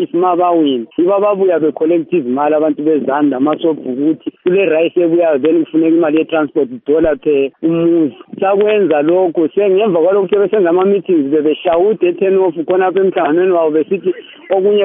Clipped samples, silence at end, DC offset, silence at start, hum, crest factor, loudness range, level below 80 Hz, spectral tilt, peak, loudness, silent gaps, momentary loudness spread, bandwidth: under 0.1%; 0 s; under 0.1%; 0 s; none; 12 dB; 1 LU; -50 dBFS; -5.5 dB/octave; 0 dBFS; -13 LUFS; none; 5 LU; 3.7 kHz